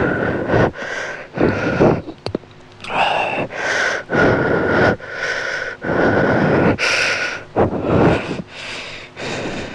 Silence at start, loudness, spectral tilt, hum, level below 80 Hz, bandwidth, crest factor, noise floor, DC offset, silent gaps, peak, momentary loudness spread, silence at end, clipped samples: 0 s; -18 LUFS; -5.5 dB/octave; none; -40 dBFS; 12 kHz; 16 dB; -38 dBFS; under 0.1%; none; -2 dBFS; 12 LU; 0 s; under 0.1%